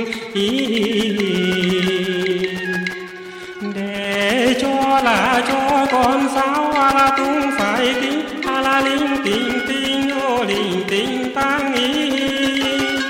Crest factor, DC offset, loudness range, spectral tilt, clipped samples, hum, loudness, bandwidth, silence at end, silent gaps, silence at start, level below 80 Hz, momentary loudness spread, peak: 12 dB; under 0.1%; 4 LU; -4 dB/octave; under 0.1%; none; -17 LUFS; 16.5 kHz; 0 s; none; 0 s; -48 dBFS; 7 LU; -6 dBFS